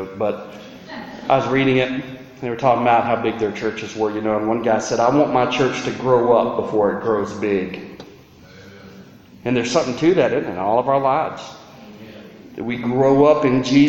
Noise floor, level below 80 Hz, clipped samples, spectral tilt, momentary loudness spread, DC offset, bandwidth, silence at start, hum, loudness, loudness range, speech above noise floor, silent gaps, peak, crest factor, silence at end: -44 dBFS; -52 dBFS; under 0.1%; -6 dB/octave; 19 LU; under 0.1%; 8.2 kHz; 0 s; none; -19 LUFS; 4 LU; 26 dB; none; -2 dBFS; 16 dB; 0 s